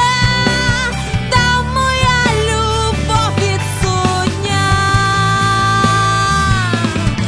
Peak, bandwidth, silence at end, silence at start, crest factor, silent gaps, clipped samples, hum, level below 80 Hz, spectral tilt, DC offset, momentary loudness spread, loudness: 0 dBFS; 11 kHz; 0 s; 0 s; 14 dB; none; under 0.1%; none; -26 dBFS; -4 dB/octave; under 0.1%; 4 LU; -13 LUFS